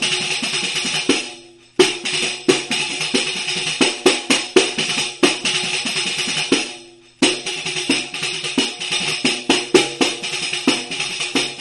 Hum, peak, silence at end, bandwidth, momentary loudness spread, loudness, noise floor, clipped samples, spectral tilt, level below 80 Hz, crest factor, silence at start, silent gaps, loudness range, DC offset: none; 0 dBFS; 0 s; 12 kHz; 6 LU; -18 LUFS; -41 dBFS; under 0.1%; -1.5 dB/octave; -60 dBFS; 20 dB; 0 s; none; 2 LU; under 0.1%